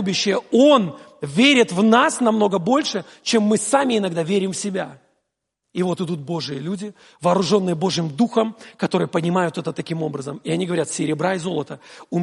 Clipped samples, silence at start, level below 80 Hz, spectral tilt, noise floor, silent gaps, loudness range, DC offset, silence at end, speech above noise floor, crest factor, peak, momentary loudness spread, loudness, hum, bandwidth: under 0.1%; 0 s; -66 dBFS; -4.5 dB/octave; -78 dBFS; none; 7 LU; under 0.1%; 0 s; 58 dB; 18 dB; -2 dBFS; 13 LU; -20 LUFS; none; 11.5 kHz